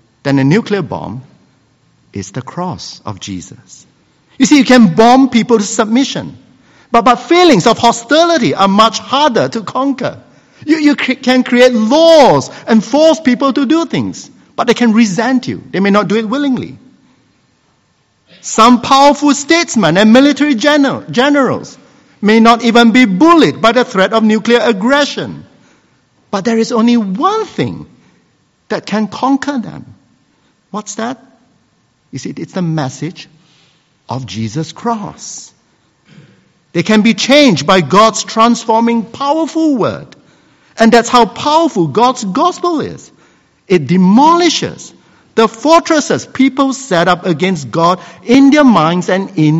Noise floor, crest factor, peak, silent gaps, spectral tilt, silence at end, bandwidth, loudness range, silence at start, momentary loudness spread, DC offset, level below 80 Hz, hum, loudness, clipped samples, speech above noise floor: -56 dBFS; 12 dB; 0 dBFS; none; -5 dB/octave; 0 s; 10 kHz; 12 LU; 0.25 s; 16 LU; under 0.1%; -50 dBFS; none; -10 LUFS; 0.8%; 46 dB